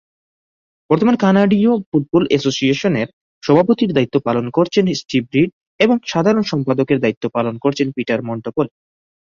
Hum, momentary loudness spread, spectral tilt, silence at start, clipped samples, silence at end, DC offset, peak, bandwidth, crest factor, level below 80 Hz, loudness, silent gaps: none; 8 LU; -6.5 dB/octave; 0.9 s; under 0.1%; 0.55 s; under 0.1%; 0 dBFS; 7.4 kHz; 16 dB; -56 dBFS; -17 LUFS; 1.86-1.92 s, 3.13-3.41 s, 5.53-5.61 s, 5.67-5.79 s, 7.17-7.21 s